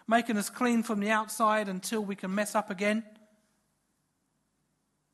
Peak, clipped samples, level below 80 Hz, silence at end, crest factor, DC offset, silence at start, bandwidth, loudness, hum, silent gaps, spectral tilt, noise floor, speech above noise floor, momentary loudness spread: -12 dBFS; under 0.1%; -80 dBFS; 2.05 s; 20 dB; under 0.1%; 0.1 s; 13 kHz; -30 LUFS; 50 Hz at -80 dBFS; none; -4.5 dB/octave; -77 dBFS; 48 dB; 6 LU